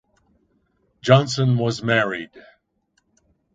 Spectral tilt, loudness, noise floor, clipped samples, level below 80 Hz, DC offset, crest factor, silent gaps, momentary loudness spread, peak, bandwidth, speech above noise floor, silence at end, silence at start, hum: -6 dB/octave; -20 LUFS; -69 dBFS; under 0.1%; -60 dBFS; under 0.1%; 22 dB; none; 14 LU; 0 dBFS; 7.8 kHz; 50 dB; 1.15 s; 1.05 s; none